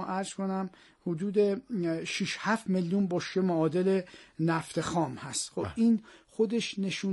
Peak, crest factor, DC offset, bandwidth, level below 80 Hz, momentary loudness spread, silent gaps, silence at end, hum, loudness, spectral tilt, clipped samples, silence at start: -14 dBFS; 16 dB; under 0.1%; 11.5 kHz; -66 dBFS; 7 LU; none; 0 s; none; -30 LUFS; -5.5 dB/octave; under 0.1%; 0 s